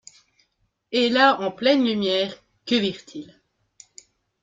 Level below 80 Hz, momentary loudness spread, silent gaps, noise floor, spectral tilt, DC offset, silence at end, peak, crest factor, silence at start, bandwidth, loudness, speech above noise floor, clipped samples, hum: -68 dBFS; 21 LU; none; -71 dBFS; -4.5 dB/octave; under 0.1%; 1.2 s; -4 dBFS; 20 dB; 0.9 s; 7.8 kHz; -21 LUFS; 50 dB; under 0.1%; none